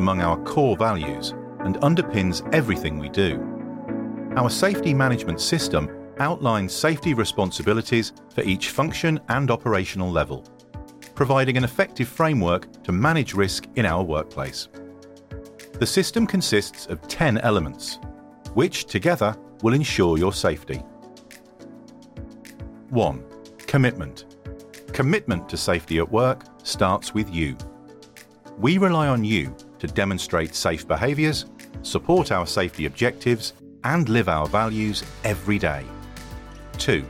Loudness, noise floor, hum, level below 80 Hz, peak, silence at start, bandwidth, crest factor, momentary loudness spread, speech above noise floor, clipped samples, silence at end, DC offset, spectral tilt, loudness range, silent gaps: -23 LUFS; -47 dBFS; none; -44 dBFS; -6 dBFS; 0 s; 16.5 kHz; 16 dB; 18 LU; 25 dB; under 0.1%; 0 s; under 0.1%; -5.5 dB/octave; 3 LU; none